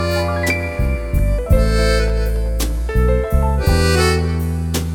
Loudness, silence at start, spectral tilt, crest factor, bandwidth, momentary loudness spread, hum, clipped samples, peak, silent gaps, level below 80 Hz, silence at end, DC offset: -18 LUFS; 0 s; -5.5 dB/octave; 14 dB; 18.5 kHz; 6 LU; none; under 0.1%; -2 dBFS; none; -18 dBFS; 0 s; under 0.1%